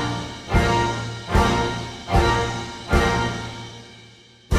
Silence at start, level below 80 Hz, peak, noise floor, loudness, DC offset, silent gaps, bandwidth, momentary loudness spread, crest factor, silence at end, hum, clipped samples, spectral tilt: 0 s; -30 dBFS; -4 dBFS; -48 dBFS; -22 LUFS; under 0.1%; none; 15 kHz; 12 LU; 18 dB; 0 s; none; under 0.1%; -5 dB/octave